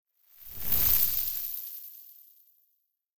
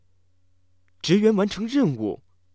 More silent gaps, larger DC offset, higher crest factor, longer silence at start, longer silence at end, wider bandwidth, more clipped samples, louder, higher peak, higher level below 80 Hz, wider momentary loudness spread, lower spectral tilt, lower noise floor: first, 0.02-0.06 s vs none; second, under 0.1% vs 0.1%; about the same, 22 dB vs 18 dB; second, 0 s vs 1.05 s; second, 0 s vs 0.4 s; first, over 20 kHz vs 8 kHz; neither; second, -26 LUFS vs -22 LUFS; second, -10 dBFS vs -6 dBFS; first, -50 dBFS vs -60 dBFS; first, 22 LU vs 12 LU; second, -1.5 dB/octave vs -6.5 dB/octave; first, -76 dBFS vs -67 dBFS